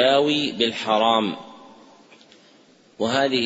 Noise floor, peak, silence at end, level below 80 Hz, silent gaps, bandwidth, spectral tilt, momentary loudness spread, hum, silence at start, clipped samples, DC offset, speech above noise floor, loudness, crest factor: -54 dBFS; -6 dBFS; 0 s; -68 dBFS; none; 8 kHz; -4 dB/octave; 12 LU; none; 0 s; under 0.1%; under 0.1%; 34 dB; -21 LUFS; 18 dB